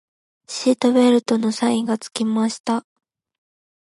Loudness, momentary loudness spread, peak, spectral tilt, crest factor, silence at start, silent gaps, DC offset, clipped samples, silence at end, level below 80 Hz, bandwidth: -19 LUFS; 9 LU; -4 dBFS; -4.5 dB/octave; 16 dB; 0.5 s; 2.60-2.64 s; under 0.1%; under 0.1%; 1 s; -72 dBFS; 11.5 kHz